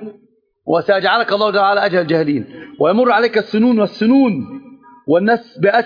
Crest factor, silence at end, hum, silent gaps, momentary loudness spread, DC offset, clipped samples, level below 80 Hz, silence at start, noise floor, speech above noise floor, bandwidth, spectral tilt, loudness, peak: 14 dB; 0 s; none; none; 17 LU; under 0.1%; under 0.1%; -62 dBFS; 0 s; -55 dBFS; 41 dB; 5.2 kHz; -7.5 dB/octave; -15 LUFS; -2 dBFS